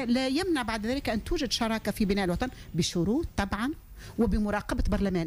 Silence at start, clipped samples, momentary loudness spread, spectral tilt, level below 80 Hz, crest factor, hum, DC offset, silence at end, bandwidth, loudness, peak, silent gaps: 0 s; under 0.1%; 6 LU; -5 dB/octave; -38 dBFS; 12 dB; none; under 0.1%; 0 s; 16 kHz; -29 LUFS; -16 dBFS; none